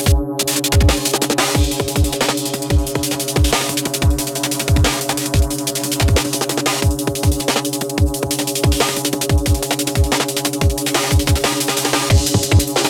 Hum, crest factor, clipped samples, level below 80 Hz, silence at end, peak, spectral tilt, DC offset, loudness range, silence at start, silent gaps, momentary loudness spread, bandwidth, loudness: none; 14 dB; under 0.1%; -24 dBFS; 0 s; -2 dBFS; -4 dB/octave; under 0.1%; 1 LU; 0 s; none; 4 LU; over 20 kHz; -17 LUFS